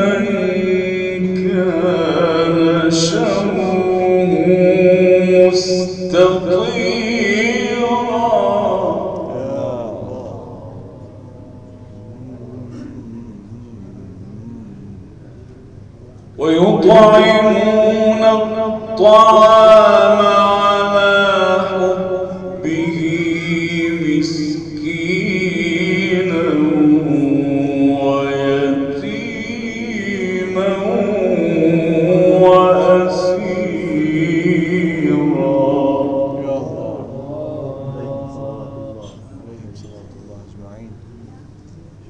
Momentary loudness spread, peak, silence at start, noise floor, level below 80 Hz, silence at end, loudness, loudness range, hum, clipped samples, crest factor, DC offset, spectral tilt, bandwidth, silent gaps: 22 LU; 0 dBFS; 0 s; -39 dBFS; -46 dBFS; 0.25 s; -14 LUFS; 22 LU; none; under 0.1%; 14 dB; under 0.1%; -6 dB/octave; 9.2 kHz; none